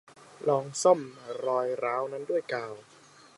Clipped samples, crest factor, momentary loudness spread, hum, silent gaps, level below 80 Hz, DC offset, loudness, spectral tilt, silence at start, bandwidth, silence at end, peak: under 0.1%; 22 dB; 13 LU; none; none; -82 dBFS; under 0.1%; -29 LUFS; -4.5 dB/octave; 0.4 s; 11.5 kHz; 0.55 s; -8 dBFS